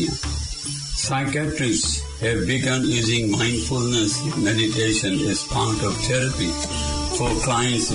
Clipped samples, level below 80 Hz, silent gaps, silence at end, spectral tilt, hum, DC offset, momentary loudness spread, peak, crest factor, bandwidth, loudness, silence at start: under 0.1%; -36 dBFS; none; 0 s; -4 dB/octave; none; under 0.1%; 5 LU; -10 dBFS; 12 dB; 11 kHz; -22 LUFS; 0 s